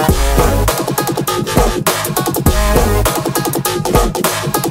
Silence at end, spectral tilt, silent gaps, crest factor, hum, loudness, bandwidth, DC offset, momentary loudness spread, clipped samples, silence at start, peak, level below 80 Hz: 0 s; -4.5 dB/octave; none; 14 dB; none; -14 LUFS; 16.5 kHz; under 0.1%; 3 LU; under 0.1%; 0 s; 0 dBFS; -20 dBFS